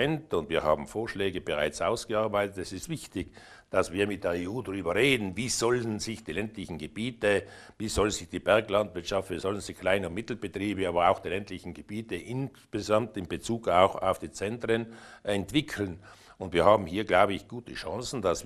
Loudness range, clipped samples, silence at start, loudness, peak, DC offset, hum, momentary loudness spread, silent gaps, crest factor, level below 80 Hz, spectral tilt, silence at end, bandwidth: 3 LU; under 0.1%; 0 s; -29 LUFS; -6 dBFS; under 0.1%; none; 13 LU; none; 24 dB; -52 dBFS; -4.5 dB/octave; 0 s; 13.5 kHz